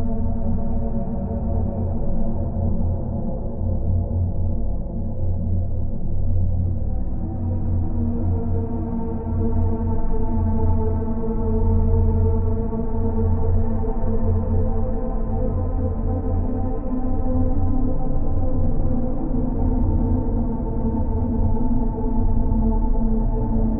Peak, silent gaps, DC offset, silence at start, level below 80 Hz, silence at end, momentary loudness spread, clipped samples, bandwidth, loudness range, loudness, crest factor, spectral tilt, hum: -6 dBFS; none; under 0.1%; 0 s; -22 dBFS; 0 s; 5 LU; under 0.1%; 1.9 kHz; 3 LU; -24 LUFS; 14 dB; -11.5 dB/octave; none